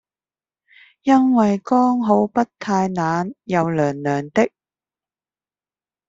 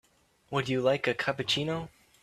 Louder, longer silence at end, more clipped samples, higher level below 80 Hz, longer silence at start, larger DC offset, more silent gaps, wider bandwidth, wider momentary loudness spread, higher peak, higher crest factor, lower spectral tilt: first, -19 LUFS vs -29 LUFS; first, 1.6 s vs 0.35 s; neither; about the same, -60 dBFS vs -64 dBFS; first, 1.05 s vs 0.5 s; neither; neither; second, 7.8 kHz vs 14 kHz; about the same, 7 LU vs 8 LU; first, -2 dBFS vs -12 dBFS; about the same, 18 dB vs 18 dB; first, -7 dB/octave vs -5 dB/octave